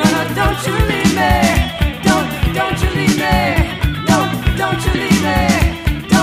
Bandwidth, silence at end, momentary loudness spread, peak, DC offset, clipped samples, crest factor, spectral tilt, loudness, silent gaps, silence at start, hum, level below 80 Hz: 15.5 kHz; 0 s; 4 LU; 0 dBFS; under 0.1%; under 0.1%; 14 dB; -5 dB/octave; -15 LUFS; none; 0 s; none; -22 dBFS